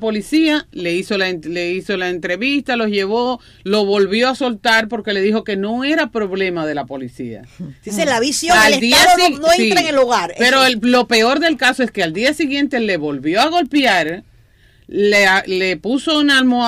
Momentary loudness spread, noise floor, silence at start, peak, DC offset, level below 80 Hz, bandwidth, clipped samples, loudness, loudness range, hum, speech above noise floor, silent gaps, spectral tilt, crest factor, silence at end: 11 LU; -50 dBFS; 0 s; -2 dBFS; under 0.1%; -48 dBFS; 16 kHz; under 0.1%; -15 LUFS; 6 LU; none; 34 dB; none; -3 dB/octave; 14 dB; 0 s